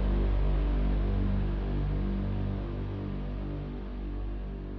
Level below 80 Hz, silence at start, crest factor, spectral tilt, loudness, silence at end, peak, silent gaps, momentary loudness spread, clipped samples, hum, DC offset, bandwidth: -32 dBFS; 0 s; 12 dB; -10 dB/octave; -33 LUFS; 0 s; -18 dBFS; none; 8 LU; under 0.1%; 50 Hz at -45 dBFS; under 0.1%; 4.7 kHz